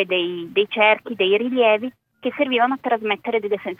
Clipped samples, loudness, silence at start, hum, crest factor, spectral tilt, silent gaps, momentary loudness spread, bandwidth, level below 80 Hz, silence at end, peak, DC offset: under 0.1%; -20 LUFS; 0 s; none; 18 dB; -6.5 dB/octave; none; 7 LU; 4.8 kHz; -72 dBFS; 0.05 s; -2 dBFS; under 0.1%